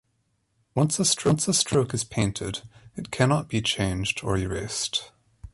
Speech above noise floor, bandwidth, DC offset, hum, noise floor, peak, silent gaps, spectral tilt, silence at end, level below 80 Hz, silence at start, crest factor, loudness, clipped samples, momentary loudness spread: 47 dB; 12 kHz; under 0.1%; none; -72 dBFS; -8 dBFS; none; -4 dB/octave; 0.05 s; -46 dBFS; 0.75 s; 18 dB; -25 LUFS; under 0.1%; 11 LU